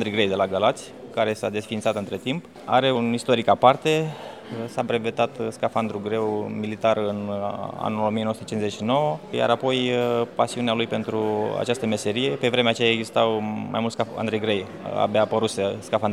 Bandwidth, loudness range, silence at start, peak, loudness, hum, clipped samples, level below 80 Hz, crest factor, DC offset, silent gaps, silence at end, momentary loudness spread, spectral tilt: 14 kHz; 3 LU; 0 s; 0 dBFS; -24 LUFS; none; under 0.1%; -64 dBFS; 22 dB; under 0.1%; none; 0 s; 8 LU; -5 dB/octave